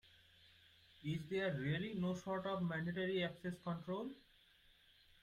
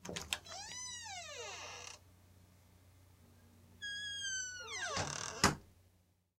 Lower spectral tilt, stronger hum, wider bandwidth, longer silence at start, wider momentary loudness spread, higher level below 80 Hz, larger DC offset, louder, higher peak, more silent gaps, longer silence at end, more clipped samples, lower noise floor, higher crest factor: first, -7 dB/octave vs -2 dB/octave; neither; second, 12.5 kHz vs 16.5 kHz; first, 0.45 s vs 0 s; second, 7 LU vs 14 LU; second, -74 dBFS vs -64 dBFS; neither; about the same, -42 LUFS vs -40 LUFS; second, -30 dBFS vs -14 dBFS; neither; first, 1.05 s vs 0.5 s; neither; about the same, -70 dBFS vs -73 dBFS; second, 14 dB vs 30 dB